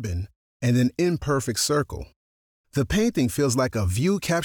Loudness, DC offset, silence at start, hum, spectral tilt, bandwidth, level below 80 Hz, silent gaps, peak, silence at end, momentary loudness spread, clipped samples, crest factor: -24 LUFS; under 0.1%; 0 s; none; -5 dB/octave; 20 kHz; -42 dBFS; 0.36-0.60 s, 2.16-2.64 s; -12 dBFS; 0 s; 10 LU; under 0.1%; 12 dB